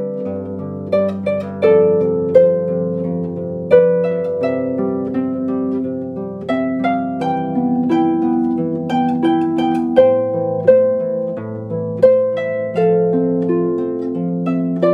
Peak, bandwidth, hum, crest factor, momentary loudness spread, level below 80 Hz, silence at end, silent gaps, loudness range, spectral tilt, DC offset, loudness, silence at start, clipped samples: 0 dBFS; 5.2 kHz; none; 16 dB; 11 LU; -62 dBFS; 0 s; none; 4 LU; -9.5 dB/octave; under 0.1%; -17 LUFS; 0 s; under 0.1%